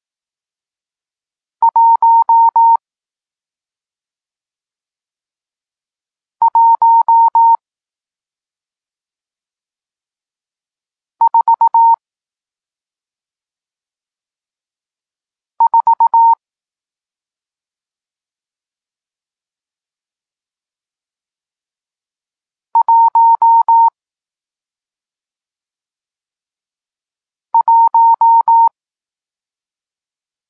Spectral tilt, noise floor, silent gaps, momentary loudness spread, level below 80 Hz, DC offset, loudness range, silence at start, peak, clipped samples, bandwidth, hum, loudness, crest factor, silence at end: -2.5 dB/octave; under -90 dBFS; none; 7 LU; -84 dBFS; under 0.1%; 7 LU; 1.6 s; -4 dBFS; under 0.1%; 1.7 kHz; none; -10 LUFS; 12 dB; 1.8 s